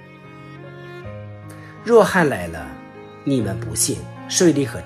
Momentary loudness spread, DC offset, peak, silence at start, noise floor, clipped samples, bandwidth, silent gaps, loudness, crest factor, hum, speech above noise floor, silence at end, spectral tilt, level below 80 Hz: 23 LU; under 0.1%; -2 dBFS; 0 s; -40 dBFS; under 0.1%; 14.5 kHz; none; -19 LUFS; 20 dB; none; 22 dB; 0 s; -4.5 dB/octave; -50 dBFS